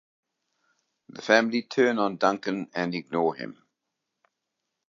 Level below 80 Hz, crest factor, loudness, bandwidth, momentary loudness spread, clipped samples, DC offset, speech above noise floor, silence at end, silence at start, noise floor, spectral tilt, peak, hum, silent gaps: -78 dBFS; 24 dB; -25 LUFS; 7.4 kHz; 13 LU; under 0.1%; under 0.1%; 58 dB; 1.4 s; 1.15 s; -83 dBFS; -5 dB/octave; -4 dBFS; none; none